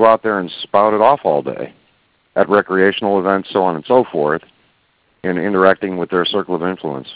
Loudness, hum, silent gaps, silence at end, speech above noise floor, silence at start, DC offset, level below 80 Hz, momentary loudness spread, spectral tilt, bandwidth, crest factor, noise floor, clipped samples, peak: -16 LUFS; none; none; 0 s; 44 dB; 0 s; under 0.1%; -56 dBFS; 11 LU; -9.5 dB/octave; 4 kHz; 16 dB; -60 dBFS; under 0.1%; 0 dBFS